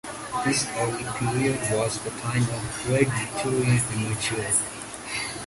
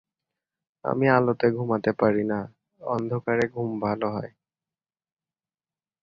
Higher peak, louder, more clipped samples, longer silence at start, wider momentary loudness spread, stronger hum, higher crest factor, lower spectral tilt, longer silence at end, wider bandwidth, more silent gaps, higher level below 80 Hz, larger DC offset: second, -8 dBFS vs -4 dBFS; about the same, -25 LUFS vs -25 LUFS; neither; second, 0.05 s vs 0.85 s; second, 7 LU vs 14 LU; neither; about the same, 18 dB vs 22 dB; second, -4 dB/octave vs -8.5 dB/octave; second, 0 s vs 1.75 s; first, 12 kHz vs 7.4 kHz; neither; first, -50 dBFS vs -62 dBFS; neither